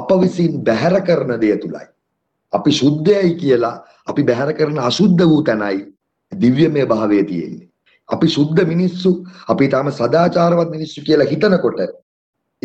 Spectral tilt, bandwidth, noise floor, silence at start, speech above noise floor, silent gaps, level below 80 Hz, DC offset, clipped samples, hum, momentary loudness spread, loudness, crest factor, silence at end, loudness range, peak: -7 dB/octave; 8.2 kHz; -72 dBFS; 0 s; 57 dB; none; -54 dBFS; under 0.1%; under 0.1%; none; 11 LU; -16 LUFS; 14 dB; 0.7 s; 2 LU; -2 dBFS